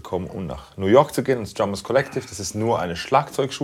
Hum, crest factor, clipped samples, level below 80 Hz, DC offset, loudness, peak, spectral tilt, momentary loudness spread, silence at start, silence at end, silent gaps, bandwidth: none; 20 dB; under 0.1%; -50 dBFS; under 0.1%; -22 LUFS; -2 dBFS; -5 dB/octave; 12 LU; 0.05 s; 0 s; none; 16.5 kHz